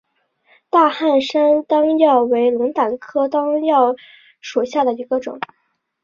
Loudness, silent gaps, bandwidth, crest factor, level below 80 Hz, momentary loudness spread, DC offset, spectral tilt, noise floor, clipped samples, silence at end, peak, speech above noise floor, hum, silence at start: -17 LUFS; none; 7.4 kHz; 16 dB; -66 dBFS; 11 LU; under 0.1%; -4.5 dB/octave; -58 dBFS; under 0.1%; 0.65 s; -2 dBFS; 42 dB; none; 0.75 s